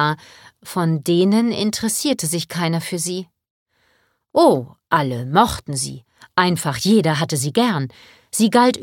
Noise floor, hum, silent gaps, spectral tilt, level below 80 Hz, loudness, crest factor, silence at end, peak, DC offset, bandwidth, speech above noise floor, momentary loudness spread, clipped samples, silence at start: -63 dBFS; none; 3.50-3.66 s; -4.5 dB/octave; -50 dBFS; -19 LUFS; 20 dB; 0 s; 0 dBFS; under 0.1%; 17.5 kHz; 45 dB; 10 LU; under 0.1%; 0 s